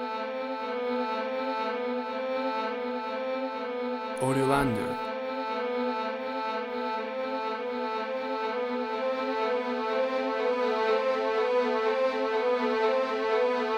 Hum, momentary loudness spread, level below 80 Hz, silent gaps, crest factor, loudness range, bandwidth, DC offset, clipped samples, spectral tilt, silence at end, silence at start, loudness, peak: none; 6 LU; -62 dBFS; none; 18 dB; 5 LU; 13 kHz; under 0.1%; under 0.1%; -5.5 dB/octave; 0 s; 0 s; -29 LUFS; -12 dBFS